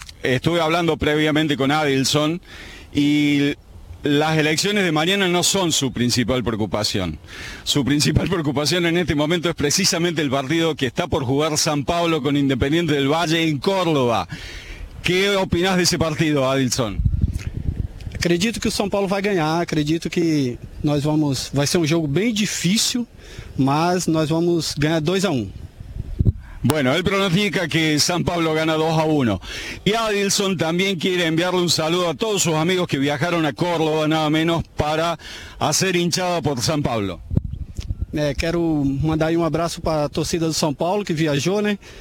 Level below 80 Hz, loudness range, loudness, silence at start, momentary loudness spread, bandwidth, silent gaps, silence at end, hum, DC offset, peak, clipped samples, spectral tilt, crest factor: -36 dBFS; 3 LU; -20 LUFS; 0 s; 8 LU; 17 kHz; none; 0 s; none; under 0.1%; 0 dBFS; under 0.1%; -4.5 dB/octave; 20 dB